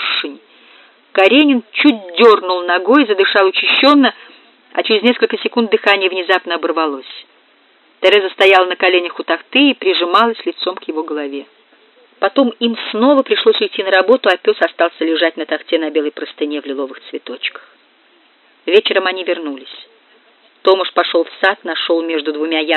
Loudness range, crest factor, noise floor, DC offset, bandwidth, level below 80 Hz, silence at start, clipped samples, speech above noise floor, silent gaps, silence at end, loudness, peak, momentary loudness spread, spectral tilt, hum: 7 LU; 14 dB; -52 dBFS; under 0.1%; 8.6 kHz; -74 dBFS; 0 s; under 0.1%; 38 dB; none; 0 s; -14 LUFS; 0 dBFS; 13 LU; -4.5 dB/octave; none